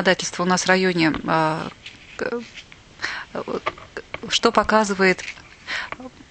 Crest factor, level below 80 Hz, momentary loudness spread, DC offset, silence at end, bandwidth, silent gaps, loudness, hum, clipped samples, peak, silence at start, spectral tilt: 22 dB; -50 dBFS; 19 LU; under 0.1%; 0.2 s; 9.2 kHz; none; -21 LUFS; none; under 0.1%; -2 dBFS; 0 s; -4 dB/octave